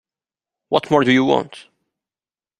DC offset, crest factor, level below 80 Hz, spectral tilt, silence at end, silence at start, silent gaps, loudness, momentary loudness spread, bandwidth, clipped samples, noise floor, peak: under 0.1%; 20 dB; -60 dBFS; -6 dB/octave; 1 s; 0.7 s; none; -17 LUFS; 7 LU; 10.5 kHz; under 0.1%; under -90 dBFS; -2 dBFS